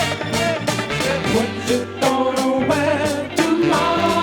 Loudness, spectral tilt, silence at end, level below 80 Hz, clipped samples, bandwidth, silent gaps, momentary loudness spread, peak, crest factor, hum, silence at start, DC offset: -19 LUFS; -4.5 dB/octave; 0 s; -48 dBFS; under 0.1%; over 20 kHz; none; 4 LU; -4 dBFS; 16 dB; none; 0 s; under 0.1%